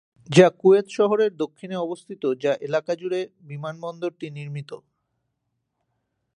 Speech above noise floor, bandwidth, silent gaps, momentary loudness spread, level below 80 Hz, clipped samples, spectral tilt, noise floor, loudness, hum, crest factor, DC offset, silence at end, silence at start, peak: 55 dB; 10.5 kHz; none; 18 LU; -74 dBFS; under 0.1%; -6 dB/octave; -77 dBFS; -22 LUFS; none; 24 dB; under 0.1%; 1.6 s; 0.3 s; 0 dBFS